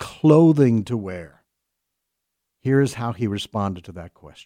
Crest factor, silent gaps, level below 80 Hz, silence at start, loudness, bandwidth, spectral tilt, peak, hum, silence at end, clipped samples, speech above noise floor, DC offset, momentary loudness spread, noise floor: 18 dB; none; -56 dBFS; 0 s; -20 LUFS; 13.5 kHz; -7.5 dB/octave; -2 dBFS; none; 0.2 s; under 0.1%; 60 dB; under 0.1%; 21 LU; -80 dBFS